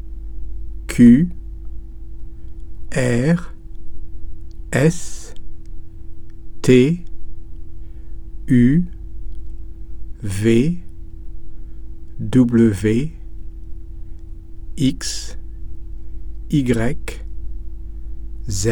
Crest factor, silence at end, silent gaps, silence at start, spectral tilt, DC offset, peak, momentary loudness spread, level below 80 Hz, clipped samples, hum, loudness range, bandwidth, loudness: 18 dB; 0 s; none; 0 s; -6.5 dB/octave; under 0.1%; 0 dBFS; 25 LU; -32 dBFS; under 0.1%; none; 7 LU; 17.5 kHz; -17 LUFS